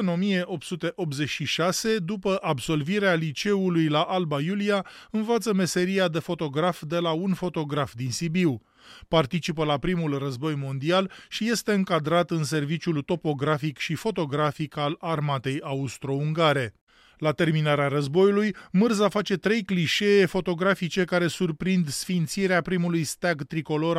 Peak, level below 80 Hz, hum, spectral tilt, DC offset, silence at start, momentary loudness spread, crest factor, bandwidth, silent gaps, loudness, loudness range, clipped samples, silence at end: -8 dBFS; -56 dBFS; none; -5.5 dB/octave; under 0.1%; 0 s; 6 LU; 16 dB; 15 kHz; 16.81-16.87 s; -25 LUFS; 4 LU; under 0.1%; 0 s